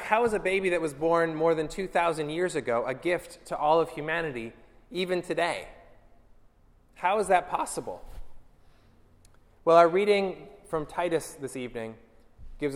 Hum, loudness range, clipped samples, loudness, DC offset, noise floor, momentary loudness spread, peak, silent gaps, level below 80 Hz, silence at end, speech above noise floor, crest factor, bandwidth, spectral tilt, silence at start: none; 5 LU; under 0.1%; -27 LUFS; under 0.1%; -60 dBFS; 14 LU; -6 dBFS; none; -54 dBFS; 0 s; 33 dB; 22 dB; 16 kHz; -5 dB/octave; 0 s